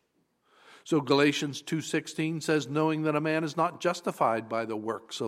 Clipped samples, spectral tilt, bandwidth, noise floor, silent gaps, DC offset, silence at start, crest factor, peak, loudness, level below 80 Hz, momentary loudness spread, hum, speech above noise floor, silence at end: under 0.1%; -5 dB/octave; 15 kHz; -72 dBFS; none; under 0.1%; 0.7 s; 20 dB; -10 dBFS; -29 LUFS; -78 dBFS; 8 LU; none; 44 dB; 0 s